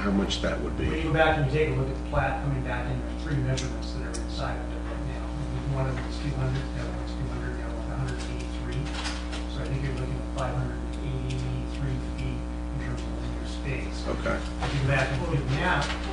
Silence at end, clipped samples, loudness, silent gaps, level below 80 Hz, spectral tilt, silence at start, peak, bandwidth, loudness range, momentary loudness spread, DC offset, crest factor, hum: 0 s; under 0.1%; -30 LUFS; none; -34 dBFS; -6 dB/octave; 0 s; -8 dBFS; 10 kHz; 5 LU; 8 LU; under 0.1%; 20 dB; none